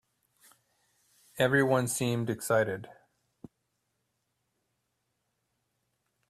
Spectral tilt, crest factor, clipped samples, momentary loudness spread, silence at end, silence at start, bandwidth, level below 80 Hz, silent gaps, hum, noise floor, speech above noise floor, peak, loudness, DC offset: -5 dB/octave; 22 dB; under 0.1%; 10 LU; 3.35 s; 1.35 s; 15.5 kHz; -70 dBFS; none; none; -80 dBFS; 52 dB; -12 dBFS; -29 LUFS; under 0.1%